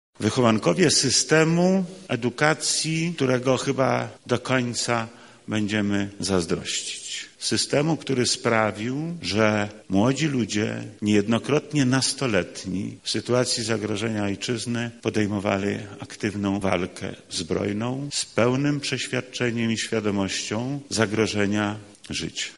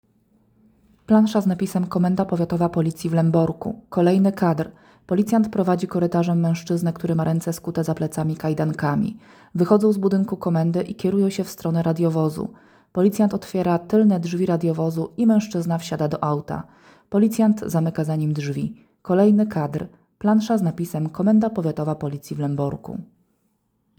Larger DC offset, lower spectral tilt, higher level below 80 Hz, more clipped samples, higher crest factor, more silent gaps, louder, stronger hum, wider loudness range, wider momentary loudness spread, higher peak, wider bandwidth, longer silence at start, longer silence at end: neither; second, -4 dB/octave vs -8 dB/octave; about the same, -58 dBFS vs -56 dBFS; neither; about the same, 22 dB vs 18 dB; neither; second, -24 LUFS vs -21 LUFS; neither; first, 5 LU vs 2 LU; about the same, 9 LU vs 9 LU; about the same, -2 dBFS vs -4 dBFS; second, 11.5 kHz vs 19.5 kHz; second, 0.2 s vs 1.1 s; second, 0.05 s vs 0.95 s